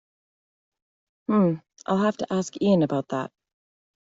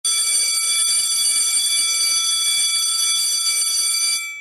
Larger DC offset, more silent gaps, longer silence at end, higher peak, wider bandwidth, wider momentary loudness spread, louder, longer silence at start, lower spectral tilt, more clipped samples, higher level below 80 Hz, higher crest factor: neither; neither; first, 0.85 s vs 0 s; about the same, -8 dBFS vs -8 dBFS; second, 7.8 kHz vs 15.5 kHz; first, 11 LU vs 1 LU; second, -25 LUFS vs -16 LUFS; first, 1.3 s vs 0.05 s; first, -7 dB/octave vs 5 dB/octave; neither; about the same, -66 dBFS vs -68 dBFS; first, 18 dB vs 12 dB